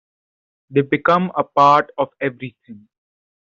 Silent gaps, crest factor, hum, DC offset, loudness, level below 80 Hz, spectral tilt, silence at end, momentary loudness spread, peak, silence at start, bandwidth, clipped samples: none; 16 dB; none; under 0.1%; -17 LUFS; -64 dBFS; -7 dB/octave; 0.7 s; 12 LU; -2 dBFS; 0.7 s; 7.6 kHz; under 0.1%